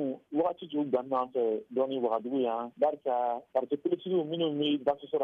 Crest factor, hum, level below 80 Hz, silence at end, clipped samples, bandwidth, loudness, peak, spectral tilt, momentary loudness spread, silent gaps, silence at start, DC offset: 14 dB; none; -76 dBFS; 0 s; under 0.1%; 4.5 kHz; -31 LUFS; -16 dBFS; -8.5 dB/octave; 3 LU; none; 0 s; under 0.1%